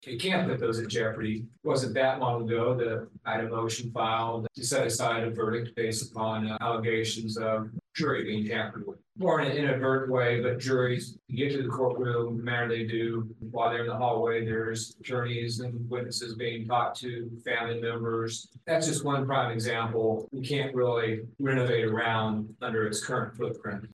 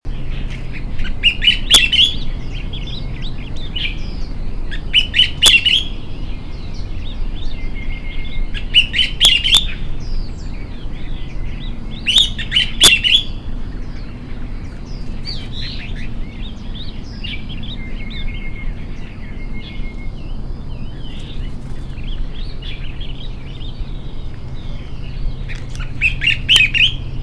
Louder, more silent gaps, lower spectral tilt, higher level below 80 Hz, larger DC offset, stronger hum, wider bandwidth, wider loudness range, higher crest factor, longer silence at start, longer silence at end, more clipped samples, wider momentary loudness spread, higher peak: second, -30 LUFS vs -13 LUFS; neither; first, -5 dB/octave vs -1.5 dB/octave; second, -68 dBFS vs -24 dBFS; neither; neither; first, 12.5 kHz vs 11 kHz; second, 3 LU vs 16 LU; about the same, 16 dB vs 18 dB; about the same, 0 s vs 0.05 s; about the same, 0.05 s vs 0 s; neither; second, 7 LU vs 21 LU; second, -14 dBFS vs 0 dBFS